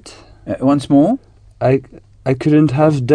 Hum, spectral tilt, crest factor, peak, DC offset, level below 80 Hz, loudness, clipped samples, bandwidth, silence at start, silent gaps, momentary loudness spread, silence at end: none; -8.5 dB/octave; 14 dB; 0 dBFS; under 0.1%; -46 dBFS; -15 LUFS; under 0.1%; 10 kHz; 0.05 s; none; 12 LU; 0 s